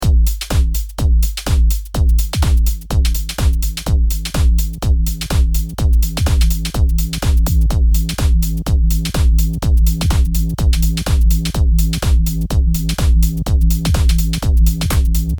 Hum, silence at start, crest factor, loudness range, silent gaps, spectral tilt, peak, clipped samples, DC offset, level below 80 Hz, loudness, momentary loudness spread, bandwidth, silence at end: none; 0 s; 12 dB; 1 LU; none; -5.5 dB/octave; -2 dBFS; under 0.1%; under 0.1%; -14 dBFS; -16 LUFS; 3 LU; over 20 kHz; 0 s